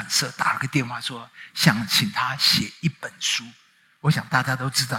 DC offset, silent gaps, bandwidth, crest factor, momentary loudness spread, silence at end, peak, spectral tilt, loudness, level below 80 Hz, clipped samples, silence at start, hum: under 0.1%; none; 16.5 kHz; 22 dB; 10 LU; 0 s; -2 dBFS; -3 dB/octave; -22 LUFS; -60 dBFS; under 0.1%; 0 s; none